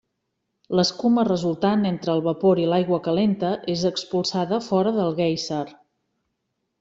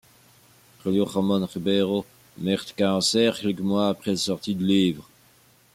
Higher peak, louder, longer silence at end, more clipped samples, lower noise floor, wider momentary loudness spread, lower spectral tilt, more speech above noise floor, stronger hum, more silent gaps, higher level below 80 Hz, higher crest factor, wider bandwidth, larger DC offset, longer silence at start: about the same, -6 dBFS vs -8 dBFS; about the same, -22 LUFS vs -24 LUFS; first, 1.1 s vs 0.7 s; neither; first, -77 dBFS vs -58 dBFS; second, 5 LU vs 8 LU; about the same, -6 dB/octave vs -5 dB/octave; first, 56 dB vs 34 dB; neither; neither; about the same, -62 dBFS vs -64 dBFS; about the same, 16 dB vs 18 dB; second, 8 kHz vs 16 kHz; neither; second, 0.7 s vs 0.85 s